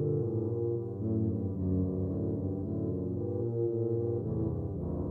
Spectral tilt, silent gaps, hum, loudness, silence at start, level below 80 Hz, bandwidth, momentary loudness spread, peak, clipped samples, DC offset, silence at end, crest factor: -14 dB/octave; none; none; -33 LUFS; 0 s; -52 dBFS; 1.8 kHz; 3 LU; -20 dBFS; under 0.1%; under 0.1%; 0 s; 12 dB